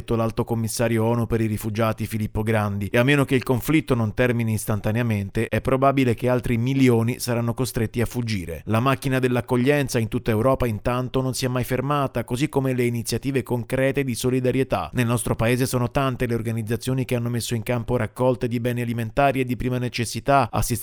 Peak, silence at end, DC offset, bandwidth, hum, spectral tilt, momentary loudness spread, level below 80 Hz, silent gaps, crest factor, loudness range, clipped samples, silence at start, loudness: -4 dBFS; 0 s; under 0.1%; over 20 kHz; none; -6 dB/octave; 5 LU; -40 dBFS; none; 18 dB; 2 LU; under 0.1%; 0 s; -23 LUFS